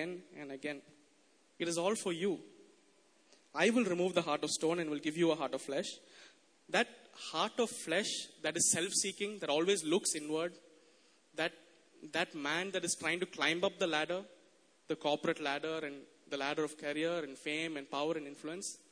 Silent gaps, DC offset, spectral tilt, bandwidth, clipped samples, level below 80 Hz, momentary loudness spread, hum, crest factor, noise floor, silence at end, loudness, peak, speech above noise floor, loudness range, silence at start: none; under 0.1%; -2.5 dB/octave; 11 kHz; under 0.1%; -84 dBFS; 12 LU; none; 22 dB; -70 dBFS; 0.15 s; -36 LUFS; -16 dBFS; 34 dB; 5 LU; 0 s